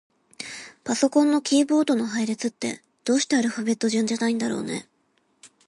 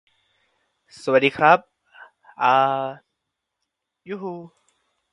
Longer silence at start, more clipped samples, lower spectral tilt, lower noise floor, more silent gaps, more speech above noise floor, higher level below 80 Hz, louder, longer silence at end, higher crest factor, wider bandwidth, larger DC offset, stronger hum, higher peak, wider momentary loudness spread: second, 0.4 s vs 1.05 s; neither; second, -3.5 dB/octave vs -5.5 dB/octave; second, -68 dBFS vs -80 dBFS; neither; second, 45 dB vs 61 dB; about the same, -72 dBFS vs -70 dBFS; second, -23 LUFS vs -20 LUFS; second, 0.2 s vs 0.65 s; second, 16 dB vs 24 dB; about the same, 11.5 kHz vs 11 kHz; neither; neither; second, -8 dBFS vs 0 dBFS; about the same, 15 LU vs 17 LU